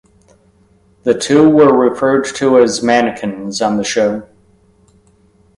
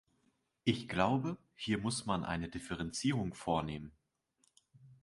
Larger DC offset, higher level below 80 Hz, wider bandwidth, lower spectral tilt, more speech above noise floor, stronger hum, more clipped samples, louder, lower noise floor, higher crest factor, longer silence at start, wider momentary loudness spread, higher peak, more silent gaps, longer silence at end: neither; first, -52 dBFS vs -58 dBFS; about the same, 11.5 kHz vs 11.5 kHz; about the same, -4.5 dB/octave vs -5 dB/octave; about the same, 40 dB vs 42 dB; neither; neither; first, -13 LUFS vs -37 LUFS; second, -52 dBFS vs -78 dBFS; second, 14 dB vs 22 dB; first, 1.05 s vs 0.65 s; about the same, 11 LU vs 10 LU; first, 0 dBFS vs -14 dBFS; neither; first, 1.35 s vs 0.1 s